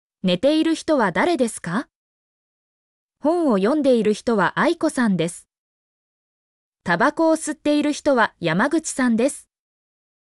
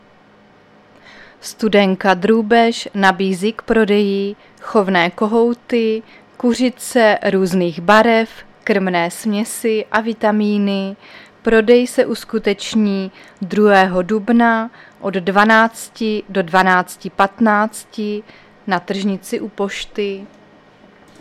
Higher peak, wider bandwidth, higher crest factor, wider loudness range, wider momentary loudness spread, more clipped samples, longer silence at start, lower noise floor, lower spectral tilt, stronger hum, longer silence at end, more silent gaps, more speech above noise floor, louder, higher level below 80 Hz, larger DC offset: second, -6 dBFS vs 0 dBFS; second, 12 kHz vs 15 kHz; about the same, 14 dB vs 16 dB; about the same, 2 LU vs 3 LU; second, 8 LU vs 13 LU; neither; second, 0.25 s vs 1.45 s; first, under -90 dBFS vs -48 dBFS; about the same, -5 dB/octave vs -5 dB/octave; neither; about the same, 0.9 s vs 0.95 s; first, 1.95-3.09 s, 5.58-6.72 s vs none; first, over 71 dB vs 32 dB; second, -20 LUFS vs -16 LUFS; second, -60 dBFS vs -50 dBFS; neither